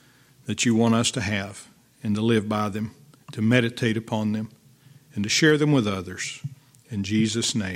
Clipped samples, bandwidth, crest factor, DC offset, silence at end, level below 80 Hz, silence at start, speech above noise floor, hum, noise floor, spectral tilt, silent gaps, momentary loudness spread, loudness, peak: under 0.1%; 15.5 kHz; 22 dB; under 0.1%; 0 s; -64 dBFS; 0.45 s; 30 dB; none; -53 dBFS; -4.5 dB/octave; none; 17 LU; -24 LUFS; -4 dBFS